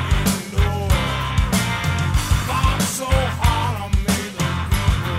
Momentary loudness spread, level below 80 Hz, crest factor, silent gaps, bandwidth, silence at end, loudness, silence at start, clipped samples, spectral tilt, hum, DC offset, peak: 3 LU; -24 dBFS; 14 dB; none; 16 kHz; 0 s; -20 LUFS; 0 s; under 0.1%; -4.5 dB/octave; none; under 0.1%; -4 dBFS